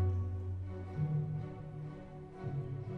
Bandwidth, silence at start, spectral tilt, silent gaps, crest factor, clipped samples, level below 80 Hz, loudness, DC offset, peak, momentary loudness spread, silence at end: 4.4 kHz; 0 s; -10.5 dB/octave; none; 14 dB; under 0.1%; -56 dBFS; -40 LUFS; under 0.1%; -24 dBFS; 11 LU; 0 s